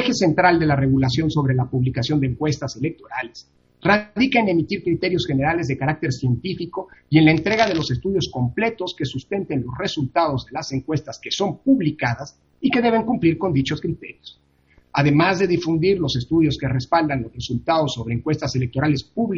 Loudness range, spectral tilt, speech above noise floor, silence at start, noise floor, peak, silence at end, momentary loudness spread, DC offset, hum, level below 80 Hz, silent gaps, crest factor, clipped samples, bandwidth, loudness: 3 LU; -6.5 dB/octave; 37 dB; 0 s; -57 dBFS; 0 dBFS; 0 s; 10 LU; under 0.1%; none; -46 dBFS; none; 20 dB; under 0.1%; 7.6 kHz; -21 LUFS